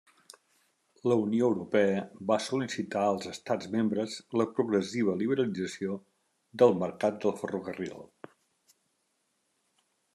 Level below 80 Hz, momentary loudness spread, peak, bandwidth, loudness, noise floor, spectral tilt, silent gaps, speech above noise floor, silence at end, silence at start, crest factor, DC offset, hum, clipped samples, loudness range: -78 dBFS; 11 LU; -10 dBFS; 12.5 kHz; -30 LUFS; -77 dBFS; -6 dB/octave; none; 48 dB; 2.1 s; 1.05 s; 22 dB; under 0.1%; none; under 0.1%; 2 LU